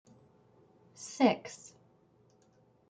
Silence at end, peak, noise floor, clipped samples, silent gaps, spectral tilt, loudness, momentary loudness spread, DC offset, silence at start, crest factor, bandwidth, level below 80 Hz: 1.35 s; -12 dBFS; -67 dBFS; under 0.1%; none; -4.5 dB/octave; -31 LUFS; 23 LU; under 0.1%; 1 s; 24 dB; 9.4 kHz; -80 dBFS